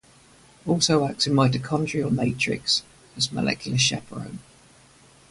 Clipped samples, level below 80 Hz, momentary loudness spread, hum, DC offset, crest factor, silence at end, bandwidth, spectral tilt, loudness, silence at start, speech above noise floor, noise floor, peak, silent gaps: under 0.1%; -54 dBFS; 16 LU; none; under 0.1%; 20 dB; 0.9 s; 11.5 kHz; -4 dB/octave; -23 LUFS; 0.65 s; 30 dB; -54 dBFS; -6 dBFS; none